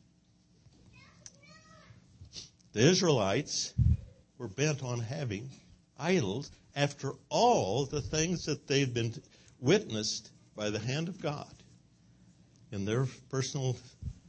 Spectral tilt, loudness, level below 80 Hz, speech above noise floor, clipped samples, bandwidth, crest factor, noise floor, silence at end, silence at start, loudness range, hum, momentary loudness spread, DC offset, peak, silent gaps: -5 dB/octave; -32 LUFS; -50 dBFS; 35 dB; under 0.1%; 8.8 kHz; 22 dB; -66 dBFS; 0.15 s; 0.95 s; 6 LU; none; 20 LU; under 0.1%; -10 dBFS; none